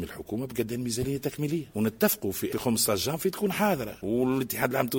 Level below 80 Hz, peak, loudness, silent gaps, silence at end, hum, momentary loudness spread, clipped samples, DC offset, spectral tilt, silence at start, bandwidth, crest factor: -56 dBFS; -8 dBFS; -28 LUFS; none; 0 s; none; 6 LU; under 0.1%; under 0.1%; -4.5 dB/octave; 0 s; 17 kHz; 20 dB